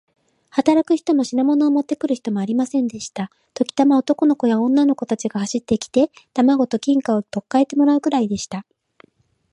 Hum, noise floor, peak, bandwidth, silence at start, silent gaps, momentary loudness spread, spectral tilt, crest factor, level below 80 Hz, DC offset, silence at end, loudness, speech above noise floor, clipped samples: none; -58 dBFS; -2 dBFS; 11 kHz; 0.55 s; none; 9 LU; -5.5 dB/octave; 18 dB; -60 dBFS; under 0.1%; 0.9 s; -19 LUFS; 40 dB; under 0.1%